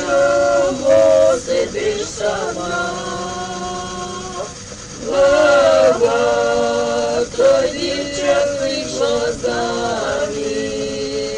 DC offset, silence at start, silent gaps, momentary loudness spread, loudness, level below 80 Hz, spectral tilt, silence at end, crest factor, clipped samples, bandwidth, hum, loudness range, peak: under 0.1%; 0 s; none; 13 LU; -17 LUFS; -42 dBFS; -3.5 dB/octave; 0 s; 14 dB; under 0.1%; 10.5 kHz; none; 7 LU; -2 dBFS